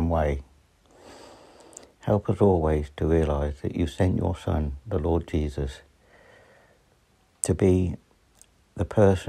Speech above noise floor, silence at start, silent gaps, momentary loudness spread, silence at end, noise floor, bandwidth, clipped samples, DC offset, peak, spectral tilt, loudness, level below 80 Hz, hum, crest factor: 39 dB; 0 s; none; 19 LU; 0 s; -63 dBFS; 13 kHz; under 0.1%; under 0.1%; -4 dBFS; -7 dB/octave; -26 LUFS; -40 dBFS; none; 22 dB